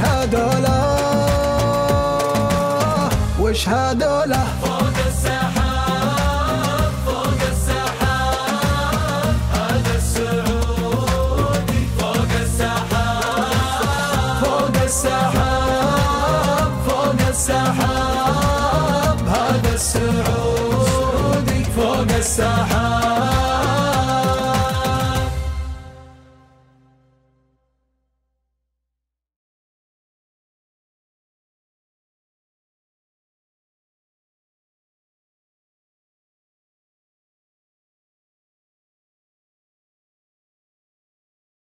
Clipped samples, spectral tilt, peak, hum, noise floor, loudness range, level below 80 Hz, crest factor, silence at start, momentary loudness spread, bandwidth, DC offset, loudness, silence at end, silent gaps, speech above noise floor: under 0.1%; -5 dB/octave; -6 dBFS; none; -82 dBFS; 2 LU; -28 dBFS; 14 dB; 0 s; 2 LU; 16 kHz; under 0.1%; -18 LUFS; 15.65 s; none; 65 dB